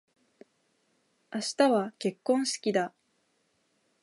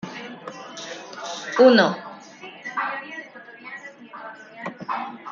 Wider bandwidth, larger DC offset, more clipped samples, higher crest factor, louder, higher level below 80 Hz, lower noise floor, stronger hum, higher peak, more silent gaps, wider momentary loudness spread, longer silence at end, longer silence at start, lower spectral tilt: first, 11.5 kHz vs 7.4 kHz; neither; neither; about the same, 22 dB vs 22 dB; second, -29 LUFS vs -21 LUFS; second, -84 dBFS vs -74 dBFS; first, -73 dBFS vs -42 dBFS; neither; second, -10 dBFS vs -2 dBFS; neither; second, 10 LU vs 24 LU; first, 1.15 s vs 0 s; first, 1.3 s vs 0.05 s; about the same, -4 dB/octave vs -4.5 dB/octave